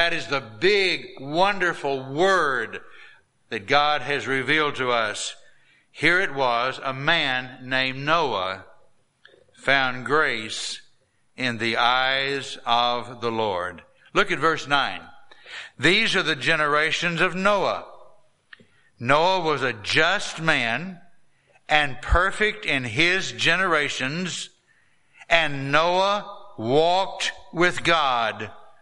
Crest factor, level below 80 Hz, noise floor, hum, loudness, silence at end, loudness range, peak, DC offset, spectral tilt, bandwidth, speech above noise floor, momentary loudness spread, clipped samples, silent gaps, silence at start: 22 dB; -44 dBFS; -63 dBFS; none; -22 LUFS; 0.1 s; 3 LU; -2 dBFS; under 0.1%; -3.5 dB/octave; 11.5 kHz; 40 dB; 10 LU; under 0.1%; none; 0 s